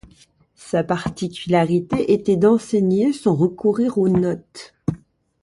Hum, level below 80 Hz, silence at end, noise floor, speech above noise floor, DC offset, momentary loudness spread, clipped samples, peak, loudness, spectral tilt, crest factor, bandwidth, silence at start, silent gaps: none; -50 dBFS; 0.45 s; -54 dBFS; 36 dB; under 0.1%; 12 LU; under 0.1%; -4 dBFS; -19 LUFS; -7.5 dB/octave; 16 dB; 11.5 kHz; 0.65 s; none